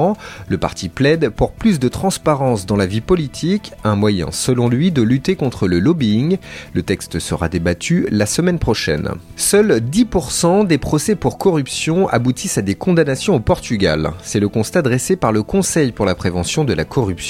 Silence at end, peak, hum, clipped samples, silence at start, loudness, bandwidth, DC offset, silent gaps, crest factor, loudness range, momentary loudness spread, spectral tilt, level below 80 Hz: 0 s; 0 dBFS; none; under 0.1%; 0 s; -17 LUFS; 16 kHz; under 0.1%; none; 16 dB; 2 LU; 6 LU; -5.5 dB/octave; -36 dBFS